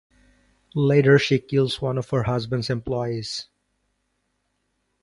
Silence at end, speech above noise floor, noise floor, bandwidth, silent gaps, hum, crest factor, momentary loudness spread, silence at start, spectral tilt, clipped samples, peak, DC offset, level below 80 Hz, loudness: 1.6 s; 52 dB; -73 dBFS; 11.5 kHz; none; 50 Hz at -55 dBFS; 20 dB; 13 LU; 0.75 s; -6.5 dB/octave; under 0.1%; -4 dBFS; under 0.1%; -52 dBFS; -22 LUFS